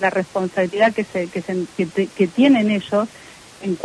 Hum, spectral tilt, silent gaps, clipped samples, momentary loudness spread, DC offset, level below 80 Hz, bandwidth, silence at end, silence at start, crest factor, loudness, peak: none; -6 dB/octave; none; under 0.1%; 11 LU; under 0.1%; -62 dBFS; 11 kHz; 0 s; 0 s; 16 dB; -19 LUFS; -4 dBFS